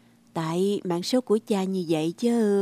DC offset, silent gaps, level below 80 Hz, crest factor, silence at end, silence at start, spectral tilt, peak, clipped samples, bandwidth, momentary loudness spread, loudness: under 0.1%; none; -74 dBFS; 14 dB; 0 s; 0.35 s; -6 dB/octave; -12 dBFS; under 0.1%; 15.5 kHz; 5 LU; -26 LUFS